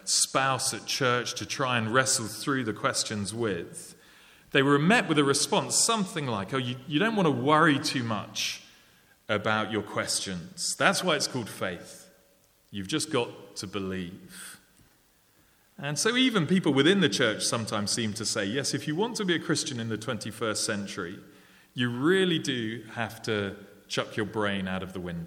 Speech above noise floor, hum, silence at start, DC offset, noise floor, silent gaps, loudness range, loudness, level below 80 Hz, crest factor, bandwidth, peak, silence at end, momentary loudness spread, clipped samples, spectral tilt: 36 dB; none; 0.05 s; under 0.1%; -64 dBFS; none; 7 LU; -27 LUFS; -68 dBFS; 24 dB; 17 kHz; -6 dBFS; 0 s; 14 LU; under 0.1%; -3.5 dB/octave